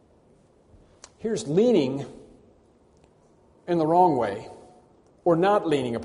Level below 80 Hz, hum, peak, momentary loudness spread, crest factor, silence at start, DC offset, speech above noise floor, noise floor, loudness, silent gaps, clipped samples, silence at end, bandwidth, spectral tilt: -62 dBFS; none; -8 dBFS; 17 LU; 18 dB; 1.25 s; under 0.1%; 36 dB; -59 dBFS; -23 LUFS; none; under 0.1%; 0 s; 10.5 kHz; -6.5 dB/octave